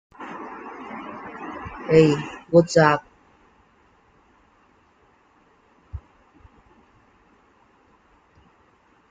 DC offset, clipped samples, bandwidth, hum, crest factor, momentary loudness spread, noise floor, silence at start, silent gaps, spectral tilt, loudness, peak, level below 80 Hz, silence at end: under 0.1%; under 0.1%; 9.2 kHz; none; 24 dB; 24 LU; -59 dBFS; 0.2 s; none; -6.5 dB/octave; -21 LUFS; -2 dBFS; -54 dBFS; 3.15 s